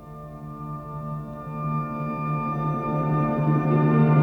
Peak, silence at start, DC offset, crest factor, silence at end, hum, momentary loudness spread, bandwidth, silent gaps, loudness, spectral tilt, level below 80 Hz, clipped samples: -8 dBFS; 0 s; under 0.1%; 16 dB; 0 s; none; 15 LU; 3.8 kHz; none; -25 LUFS; -11 dB/octave; -50 dBFS; under 0.1%